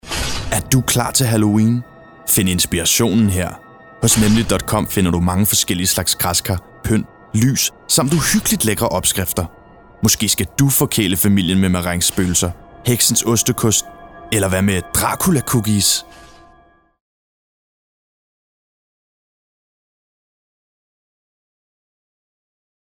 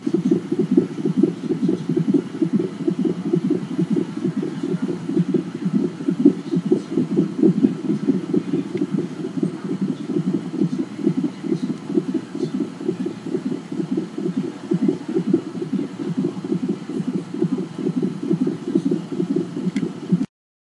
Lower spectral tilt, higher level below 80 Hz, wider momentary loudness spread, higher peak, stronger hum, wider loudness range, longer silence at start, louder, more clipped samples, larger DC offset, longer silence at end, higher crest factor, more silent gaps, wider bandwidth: second, -4 dB/octave vs -8.5 dB/octave; first, -38 dBFS vs -72 dBFS; about the same, 7 LU vs 6 LU; about the same, -2 dBFS vs 0 dBFS; neither; about the same, 3 LU vs 4 LU; about the same, 0.05 s vs 0 s; first, -16 LUFS vs -23 LUFS; neither; first, 0.1% vs under 0.1%; first, 6.7 s vs 0.55 s; second, 16 dB vs 22 dB; neither; first, over 20 kHz vs 11.5 kHz